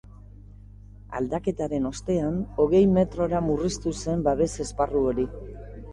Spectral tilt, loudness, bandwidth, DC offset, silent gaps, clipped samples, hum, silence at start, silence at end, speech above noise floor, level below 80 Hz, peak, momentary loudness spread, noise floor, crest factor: -7 dB/octave; -25 LUFS; 11.5 kHz; under 0.1%; none; under 0.1%; 50 Hz at -40 dBFS; 0.4 s; 0 s; 21 dB; -42 dBFS; -8 dBFS; 12 LU; -45 dBFS; 16 dB